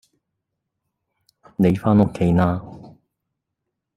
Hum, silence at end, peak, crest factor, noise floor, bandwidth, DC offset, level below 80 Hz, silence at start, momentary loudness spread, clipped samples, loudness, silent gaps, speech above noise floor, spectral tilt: none; 1.1 s; -2 dBFS; 20 dB; -80 dBFS; 13 kHz; under 0.1%; -48 dBFS; 1.6 s; 17 LU; under 0.1%; -19 LUFS; none; 63 dB; -9.5 dB/octave